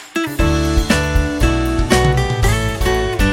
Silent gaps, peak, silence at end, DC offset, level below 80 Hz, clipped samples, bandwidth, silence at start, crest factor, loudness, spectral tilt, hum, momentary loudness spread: none; -2 dBFS; 0 s; under 0.1%; -20 dBFS; under 0.1%; 16.5 kHz; 0 s; 14 dB; -16 LUFS; -5 dB/octave; none; 4 LU